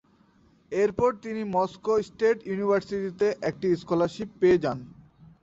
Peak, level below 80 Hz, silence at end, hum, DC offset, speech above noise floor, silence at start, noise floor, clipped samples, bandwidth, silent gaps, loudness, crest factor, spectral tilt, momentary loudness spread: -12 dBFS; -58 dBFS; 0.5 s; none; under 0.1%; 35 dB; 0.7 s; -61 dBFS; under 0.1%; 8 kHz; none; -26 LUFS; 16 dB; -7 dB/octave; 8 LU